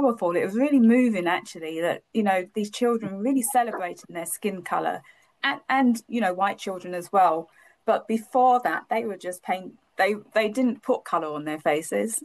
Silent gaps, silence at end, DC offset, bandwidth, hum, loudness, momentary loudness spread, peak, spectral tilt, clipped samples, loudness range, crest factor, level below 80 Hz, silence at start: none; 0 s; under 0.1%; 12.5 kHz; none; -25 LUFS; 11 LU; -10 dBFS; -4.5 dB/octave; under 0.1%; 3 LU; 14 dB; -76 dBFS; 0 s